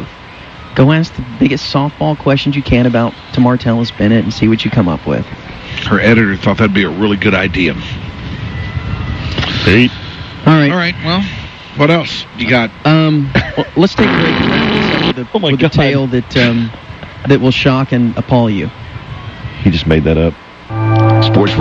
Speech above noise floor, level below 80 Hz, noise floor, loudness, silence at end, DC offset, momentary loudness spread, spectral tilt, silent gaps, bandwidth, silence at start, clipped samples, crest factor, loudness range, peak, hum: 21 dB; -32 dBFS; -32 dBFS; -12 LUFS; 0 s; under 0.1%; 14 LU; -7 dB/octave; none; 7.6 kHz; 0 s; under 0.1%; 12 dB; 2 LU; 0 dBFS; none